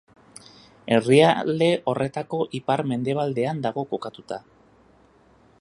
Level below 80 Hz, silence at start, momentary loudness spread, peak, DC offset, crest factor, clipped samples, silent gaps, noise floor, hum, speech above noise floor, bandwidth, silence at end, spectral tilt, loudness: -64 dBFS; 0.85 s; 18 LU; -4 dBFS; under 0.1%; 20 dB; under 0.1%; none; -56 dBFS; none; 34 dB; 11.5 kHz; 1.2 s; -6 dB/octave; -23 LUFS